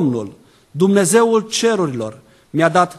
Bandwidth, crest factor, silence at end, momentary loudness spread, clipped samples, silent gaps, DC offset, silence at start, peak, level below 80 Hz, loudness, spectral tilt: 13 kHz; 16 dB; 0 s; 16 LU; under 0.1%; none; under 0.1%; 0 s; 0 dBFS; -62 dBFS; -16 LUFS; -4.5 dB/octave